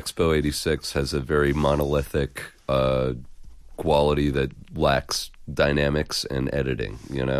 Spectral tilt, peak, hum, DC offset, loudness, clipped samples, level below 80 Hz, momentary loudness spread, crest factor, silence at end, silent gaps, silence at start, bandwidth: -5.5 dB/octave; -8 dBFS; none; under 0.1%; -24 LUFS; under 0.1%; -36 dBFS; 9 LU; 16 dB; 0 s; none; 0 s; 15 kHz